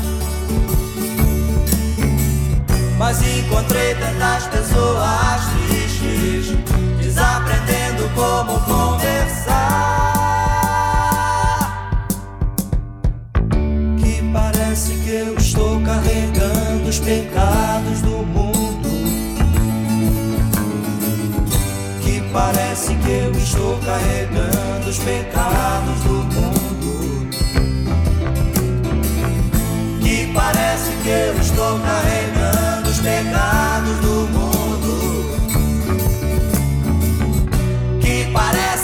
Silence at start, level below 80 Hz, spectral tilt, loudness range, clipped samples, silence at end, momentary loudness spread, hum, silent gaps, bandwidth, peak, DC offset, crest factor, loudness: 0 s; -22 dBFS; -5 dB/octave; 2 LU; under 0.1%; 0 s; 4 LU; none; none; 20 kHz; -2 dBFS; under 0.1%; 16 dB; -18 LUFS